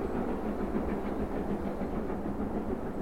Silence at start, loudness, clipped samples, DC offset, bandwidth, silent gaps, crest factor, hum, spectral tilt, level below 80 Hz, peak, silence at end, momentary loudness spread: 0 s; -34 LUFS; under 0.1%; 0.7%; 16.5 kHz; none; 16 dB; none; -8.5 dB/octave; -42 dBFS; -18 dBFS; 0 s; 2 LU